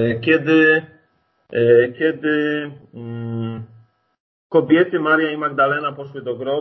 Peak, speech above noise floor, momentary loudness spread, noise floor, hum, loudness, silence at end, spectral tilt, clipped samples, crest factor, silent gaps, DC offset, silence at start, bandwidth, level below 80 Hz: -2 dBFS; 45 dB; 16 LU; -63 dBFS; none; -18 LUFS; 0 s; -8.5 dB/octave; under 0.1%; 16 dB; 4.20-4.50 s; under 0.1%; 0 s; 6 kHz; -60 dBFS